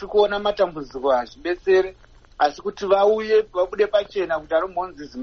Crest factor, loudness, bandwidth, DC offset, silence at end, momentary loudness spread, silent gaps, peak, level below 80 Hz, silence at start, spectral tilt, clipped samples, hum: 16 dB; -21 LUFS; 6.6 kHz; under 0.1%; 0 s; 10 LU; none; -6 dBFS; -50 dBFS; 0 s; -2.5 dB/octave; under 0.1%; none